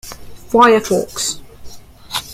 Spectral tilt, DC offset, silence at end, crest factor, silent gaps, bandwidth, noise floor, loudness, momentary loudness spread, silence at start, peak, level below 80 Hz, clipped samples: -3 dB/octave; under 0.1%; 0 s; 16 dB; none; 16.5 kHz; -33 dBFS; -15 LUFS; 18 LU; 0.05 s; 0 dBFS; -44 dBFS; under 0.1%